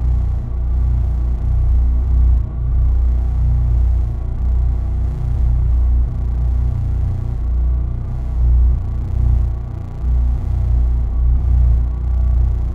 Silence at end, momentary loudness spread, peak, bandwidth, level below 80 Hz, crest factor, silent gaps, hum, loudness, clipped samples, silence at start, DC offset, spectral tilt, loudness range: 0 s; 6 LU; -4 dBFS; 2.2 kHz; -16 dBFS; 10 dB; none; 60 Hz at -25 dBFS; -19 LUFS; under 0.1%; 0 s; under 0.1%; -10 dB/octave; 2 LU